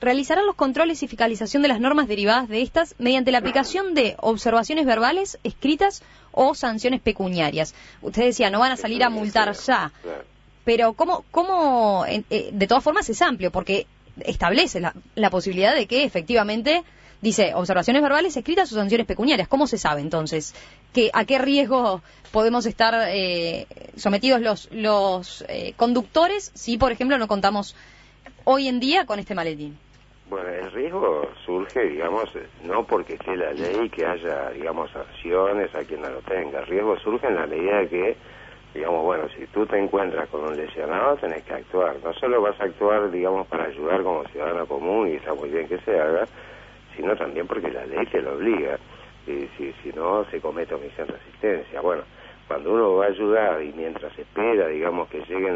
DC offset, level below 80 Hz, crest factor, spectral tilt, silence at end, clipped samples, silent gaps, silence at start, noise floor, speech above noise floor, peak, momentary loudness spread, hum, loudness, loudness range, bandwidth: under 0.1%; -50 dBFS; 20 dB; -4.5 dB/octave; 0 s; under 0.1%; none; 0 s; -48 dBFS; 26 dB; -4 dBFS; 11 LU; 50 Hz at -55 dBFS; -23 LUFS; 6 LU; 8 kHz